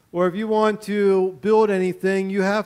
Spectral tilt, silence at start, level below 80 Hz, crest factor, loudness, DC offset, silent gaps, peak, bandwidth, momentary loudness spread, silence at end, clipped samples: -6.5 dB/octave; 0.15 s; -64 dBFS; 14 dB; -20 LUFS; under 0.1%; none; -6 dBFS; 14.5 kHz; 4 LU; 0 s; under 0.1%